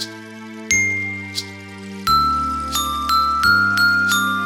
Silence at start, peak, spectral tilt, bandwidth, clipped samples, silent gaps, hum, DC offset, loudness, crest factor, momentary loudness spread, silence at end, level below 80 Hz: 0 s; -2 dBFS; -2 dB/octave; over 20 kHz; under 0.1%; none; none; under 0.1%; -17 LUFS; 18 dB; 19 LU; 0 s; -40 dBFS